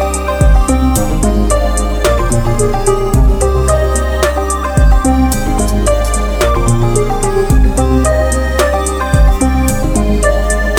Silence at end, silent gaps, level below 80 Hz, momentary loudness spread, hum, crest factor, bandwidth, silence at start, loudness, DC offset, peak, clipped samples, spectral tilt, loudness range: 0 s; none; -12 dBFS; 3 LU; none; 10 dB; 19 kHz; 0 s; -12 LUFS; under 0.1%; 0 dBFS; under 0.1%; -5.5 dB/octave; 1 LU